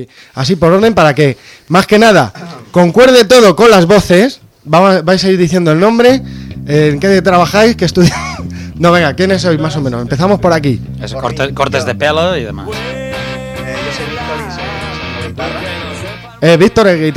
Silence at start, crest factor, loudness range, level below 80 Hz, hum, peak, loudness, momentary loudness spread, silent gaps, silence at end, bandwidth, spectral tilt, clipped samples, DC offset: 0 s; 10 dB; 11 LU; -34 dBFS; none; 0 dBFS; -10 LUFS; 15 LU; none; 0 s; 16.5 kHz; -5.5 dB/octave; under 0.1%; under 0.1%